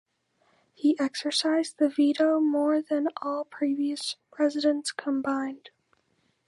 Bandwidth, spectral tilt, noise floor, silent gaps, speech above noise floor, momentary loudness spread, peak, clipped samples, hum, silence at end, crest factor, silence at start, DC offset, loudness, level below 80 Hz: 11.5 kHz; -2.5 dB/octave; -71 dBFS; none; 45 dB; 9 LU; -12 dBFS; under 0.1%; none; 0.9 s; 16 dB; 0.85 s; under 0.1%; -27 LUFS; -82 dBFS